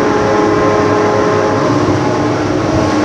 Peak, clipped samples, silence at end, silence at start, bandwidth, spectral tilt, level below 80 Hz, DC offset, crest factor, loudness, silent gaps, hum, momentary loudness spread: 0 dBFS; under 0.1%; 0 s; 0 s; 10 kHz; -6 dB/octave; -36 dBFS; under 0.1%; 10 dB; -12 LUFS; none; none; 3 LU